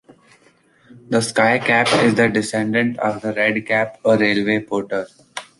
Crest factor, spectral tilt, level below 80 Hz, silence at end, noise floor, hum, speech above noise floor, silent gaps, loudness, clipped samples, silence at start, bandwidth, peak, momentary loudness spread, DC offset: 18 dB; -4.5 dB/octave; -58 dBFS; 0.15 s; -55 dBFS; none; 37 dB; none; -18 LUFS; under 0.1%; 0.9 s; 11.5 kHz; -2 dBFS; 8 LU; under 0.1%